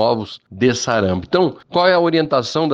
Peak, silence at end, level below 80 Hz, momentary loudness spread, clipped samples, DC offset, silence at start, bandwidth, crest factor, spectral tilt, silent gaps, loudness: -4 dBFS; 0 s; -52 dBFS; 5 LU; under 0.1%; under 0.1%; 0 s; 9.2 kHz; 14 dB; -5 dB/octave; none; -17 LUFS